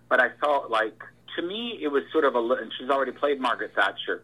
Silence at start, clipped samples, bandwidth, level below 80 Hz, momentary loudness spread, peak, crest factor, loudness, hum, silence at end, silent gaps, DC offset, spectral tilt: 0.1 s; under 0.1%; 12.5 kHz; -74 dBFS; 8 LU; -8 dBFS; 18 dB; -26 LUFS; none; 0.05 s; none; under 0.1%; -4 dB/octave